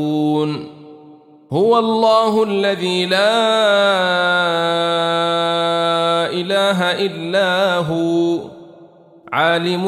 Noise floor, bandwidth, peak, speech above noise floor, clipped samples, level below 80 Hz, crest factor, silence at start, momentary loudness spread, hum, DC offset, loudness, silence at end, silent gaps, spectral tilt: -44 dBFS; 14.5 kHz; -2 dBFS; 28 dB; under 0.1%; -64 dBFS; 14 dB; 0 s; 6 LU; none; under 0.1%; -16 LUFS; 0 s; none; -5 dB/octave